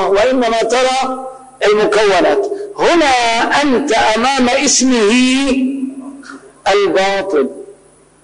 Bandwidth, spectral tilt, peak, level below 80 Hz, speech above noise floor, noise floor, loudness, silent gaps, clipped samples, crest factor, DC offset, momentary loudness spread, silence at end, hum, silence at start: 10.5 kHz; -2.5 dB/octave; -2 dBFS; -44 dBFS; 34 dB; -46 dBFS; -13 LUFS; none; under 0.1%; 12 dB; 1%; 11 LU; 0.5 s; none; 0 s